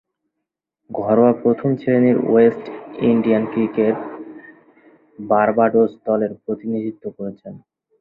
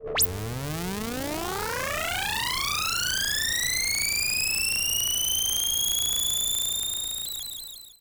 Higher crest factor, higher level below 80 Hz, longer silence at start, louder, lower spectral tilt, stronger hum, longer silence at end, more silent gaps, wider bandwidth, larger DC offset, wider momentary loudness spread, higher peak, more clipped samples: about the same, 18 dB vs 16 dB; second, -60 dBFS vs -46 dBFS; first, 0.9 s vs 0 s; first, -18 LUFS vs -25 LUFS; first, -11 dB/octave vs -0.5 dB/octave; neither; first, 0.4 s vs 0.1 s; neither; second, 4.1 kHz vs over 20 kHz; neither; first, 17 LU vs 8 LU; first, -2 dBFS vs -10 dBFS; neither